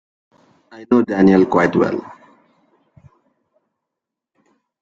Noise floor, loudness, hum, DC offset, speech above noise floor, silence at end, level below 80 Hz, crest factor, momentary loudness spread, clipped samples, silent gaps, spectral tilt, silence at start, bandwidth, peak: -83 dBFS; -15 LUFS; none; under 0.1%; 68 dB; 2.7 s; -54 dBFS; 18 dB; 8 LU; under 0.1%; none; -8 dB/octave; 0.75 s; 7.4 kHz; -2 dBFS